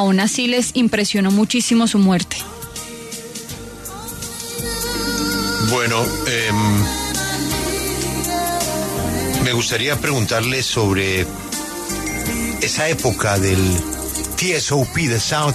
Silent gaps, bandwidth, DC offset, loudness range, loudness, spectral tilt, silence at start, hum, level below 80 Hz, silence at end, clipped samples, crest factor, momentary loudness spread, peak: none; 14 kHz; under 0.1%; 3 LU; -18 LUFS; -4 dB/octave; 0 s; none; -36 dBFS; 0 s; under 0.1%; 14 dB; 12 LU; -4 dBFS